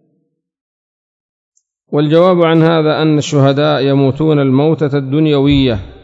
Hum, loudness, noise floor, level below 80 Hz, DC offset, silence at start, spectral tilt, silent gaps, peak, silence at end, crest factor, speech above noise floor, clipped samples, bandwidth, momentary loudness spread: none; -11 LUFS; -64 dBFS; -38 dBFS; under 0.1%; 1.9 s; -7 dB/octave; none; 0 dBFS; 0.1 s; 12 dB; 53 dB; 0.2%; 7.8 kHz; 5 LU